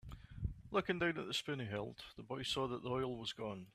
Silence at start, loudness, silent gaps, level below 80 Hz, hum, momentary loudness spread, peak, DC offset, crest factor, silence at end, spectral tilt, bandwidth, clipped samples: 0.05 s; -41 LUFS; none; -58 dBFS; none; 10 LU; -22 dBFS; under 0.1%; 20 dB; 0.05 s; -5 dB/octave; 14.5 kHz; under 0.1%